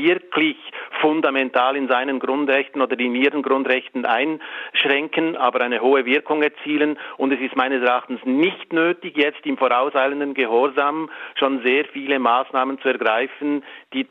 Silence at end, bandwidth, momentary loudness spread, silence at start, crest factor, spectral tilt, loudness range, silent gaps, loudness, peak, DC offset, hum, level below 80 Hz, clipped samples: 0.05 s; 4.9 kHz; 5 LU; 0 s; 16 dB; -6.5 dB/octave; 1 LU; none; -20 LUFS; -4 dBFS; under 0.1%; none; -78 dBFS; under 0.1%